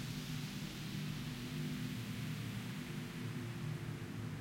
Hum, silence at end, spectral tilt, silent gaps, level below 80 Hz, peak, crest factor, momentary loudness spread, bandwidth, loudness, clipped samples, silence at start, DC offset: none; 0 s; -5.5 dB/octave; none; -62 dBFS; -30 dBFS; 12 dB; 2 LU; 16.5 kHz; -44 LUFS; under 0.1%; 0 s; under 0.1%